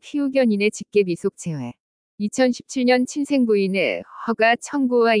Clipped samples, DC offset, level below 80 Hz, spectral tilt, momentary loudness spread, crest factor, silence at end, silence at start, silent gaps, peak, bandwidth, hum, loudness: under 0.1%; under 0.1%; -68 dBFS; -5 dB/octave; 10 LU; 16 dB; 0 s; 0.05 s; 1.80-2.18 s; -6 dBFS; 10.5 kHz; none; -21 LUFS